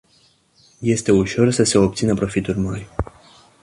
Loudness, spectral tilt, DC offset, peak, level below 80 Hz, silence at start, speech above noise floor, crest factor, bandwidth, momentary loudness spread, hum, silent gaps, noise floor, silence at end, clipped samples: -19 LUFS; -5.5 dB/octave; under 0.1%; -2 dBFS; -40 dBFS; 0.8 s; 40 dB; 18 dB; 11.5 kHz; 13 LU; none; none; -57 dBFS; 0.6 s; under 0.1%